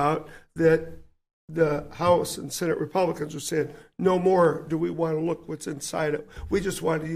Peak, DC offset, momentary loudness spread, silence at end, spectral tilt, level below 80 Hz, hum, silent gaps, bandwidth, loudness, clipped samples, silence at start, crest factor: -8 dBFS; under 0.1%; 11 LU; 0 s; -5.5 dB/octave; -50 dBFS; none; 1.33-1.48 s; 15.5 kHz; -26 LUFS; under 0.1%; 0 s; 18 dB